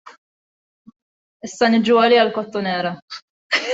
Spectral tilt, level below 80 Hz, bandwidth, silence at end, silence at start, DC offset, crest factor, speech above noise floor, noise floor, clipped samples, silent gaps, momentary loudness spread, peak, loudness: -4.5 dB/octave; -66 dBFS; 8 kHz; 0 s; 0.05 s; under 0.1%; 18 dB; over 73 dB; under -90 dBFS; under 0.1%; 0.18-0.85 s, 0.96-1.40 s, 3.02-3.08 s, 3.22-3.50 s; 22 LU; -2 dBFS; -17 LUFS